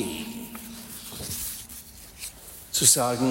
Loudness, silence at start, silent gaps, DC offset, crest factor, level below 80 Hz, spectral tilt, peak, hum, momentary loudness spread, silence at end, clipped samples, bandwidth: -23 LUFS; 0 s; none; under 0.1%; 24 dB; -52 dBFS; -2.5 dB/octave; -4 dBFS; none; 22 LU; 0 s; under 0.1%; 16.5 kHz